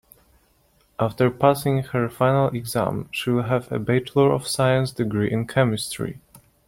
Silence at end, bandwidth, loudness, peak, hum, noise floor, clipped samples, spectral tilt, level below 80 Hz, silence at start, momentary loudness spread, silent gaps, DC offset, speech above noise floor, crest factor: 0.3 s; 16.5 kHz; -22 LUFS; -2 dBFS; none; -61 dBFS; under 0.1%; -6 dB/octave; -54 dBFS; 1 s; 8 LU; none; under 0.1%; 40 dB; 20 dB